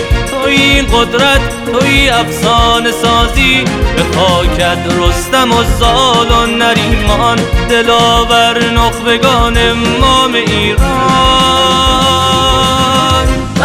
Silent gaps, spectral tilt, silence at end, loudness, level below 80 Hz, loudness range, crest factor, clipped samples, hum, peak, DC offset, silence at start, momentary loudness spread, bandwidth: none; -4 dB/octave; 0 s; -9 LUFS; -18 dBFS; 1 LU; 10 dB; under 0.1%; none; 0 dBFS; under 0.1%; 0 s; 4 LU; 16 kHz